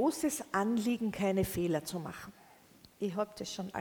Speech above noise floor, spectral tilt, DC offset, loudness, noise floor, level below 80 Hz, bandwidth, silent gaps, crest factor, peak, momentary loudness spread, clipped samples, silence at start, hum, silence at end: 26 dB; -5 dB/octave; under 0.1%; -34 LUFS; -60 dBFS; -60 dBFS; over 20 kHz; none; 16 dB; -18 dBFS; 10 LU; under 0.1%; 0 s; none; 0 s